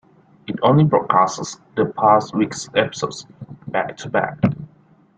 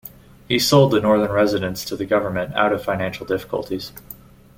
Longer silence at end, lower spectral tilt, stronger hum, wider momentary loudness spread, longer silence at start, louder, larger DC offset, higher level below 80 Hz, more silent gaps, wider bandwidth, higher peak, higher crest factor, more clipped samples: about the same, 0.5 s vs 0.45 s; about the same, -6 dB/octave vs -5 dB/octave; neither; about the same, 17 LU vs 19 LU; first, 0.5 s vs 0.05 s; about the same, -19 LUFS vs -20 LUFS; neither; second, -56 dBFS vs -50 dBFS; neither; second, 9.2 kHz vs 17 kHz; about the same, -2 dBFS vs -2 dBFS; about the same, 18 dB vs 18 dB; neither